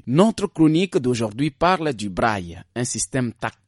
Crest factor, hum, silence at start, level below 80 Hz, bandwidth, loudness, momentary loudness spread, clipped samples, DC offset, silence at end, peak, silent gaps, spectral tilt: 20 dB; none; 0.05 s; -48 dBFS; 11.5 kHz; -21 LUFS; 9 LU; under 0.1%; under 0.1%; 0.2 s; -2 dBFS; none; -5 dB/octave